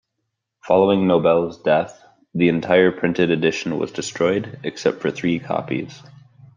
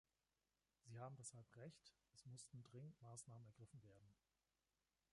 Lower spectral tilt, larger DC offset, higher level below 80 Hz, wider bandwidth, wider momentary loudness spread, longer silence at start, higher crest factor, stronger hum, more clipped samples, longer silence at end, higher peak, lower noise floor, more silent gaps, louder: first, -6 dB/octave vs -4.5 dB/octave; neither; first, -60 dBFS vs -88 dBFS; second, 9.8 kHz vs 11.5 kHz; about the same, 11 LU vs 9 LU; second, 0.65 s vs 0.85 s; about the same, 18 dB vs 20 dB; neither; neither; second, 0.55 s vs 1 s; first, -2 dBFS vs -44 dBFS; second, -77 dBFS vs under -90 dBFS; neither; first, -20 LUFS vs -61 LUFS